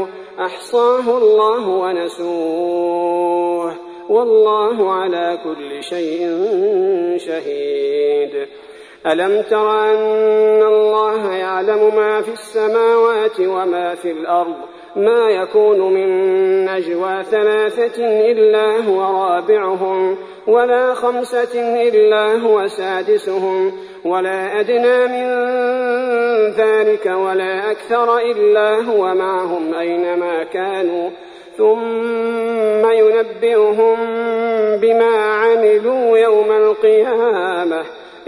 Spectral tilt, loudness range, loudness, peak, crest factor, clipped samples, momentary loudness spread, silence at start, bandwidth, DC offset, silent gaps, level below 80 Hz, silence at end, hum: -5 dB/octave; 4 LU; -15 LUFS; -2 dBFS; 12 dB; under 0.1%; 9 LU; 0 s; 11 kHz; under 0.1%; none; -66 dBFS; 0.05 s; none